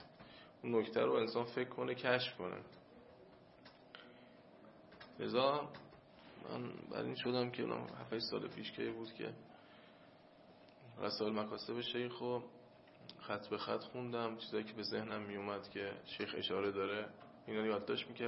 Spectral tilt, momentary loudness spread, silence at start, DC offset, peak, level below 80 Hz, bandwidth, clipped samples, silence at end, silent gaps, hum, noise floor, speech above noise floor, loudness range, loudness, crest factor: -3 dB/octave; 24 LU; 0 s; under 0.1%; -18 dBFS; -80 dBFS; 5.8 kHz; under 0.1%; 0 s; none; none; -63 dBFS; 22 dB; 5 LU; -41 LUFS; 26 dB